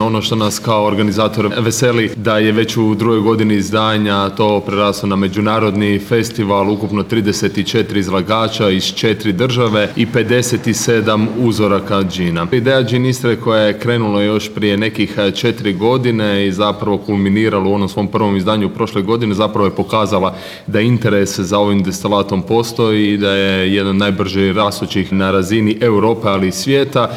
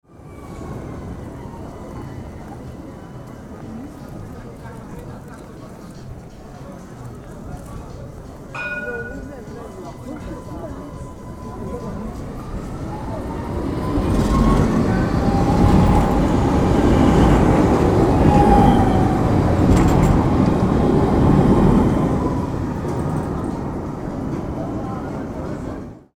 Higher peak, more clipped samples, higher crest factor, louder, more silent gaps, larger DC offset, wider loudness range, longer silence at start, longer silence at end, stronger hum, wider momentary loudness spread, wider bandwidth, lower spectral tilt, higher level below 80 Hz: about the same, 0 dBFS vs 0 dBFS; neither; about the same, 14 dB vs 18 dB; first, -14 LUFS vs -18 LUFS; neither; neither; second, 1 LU vs 20 LU; second, 0 s vs 0.2 s; second, 0 s vs 0.2 s; neither; second, 3 LU vs 21 LU; about the same, 16 kHz vs 15.5 kHz; second, -5.5 dB/octave vs -8 dB/octave; second, -48 dBFS vs -28 dBFS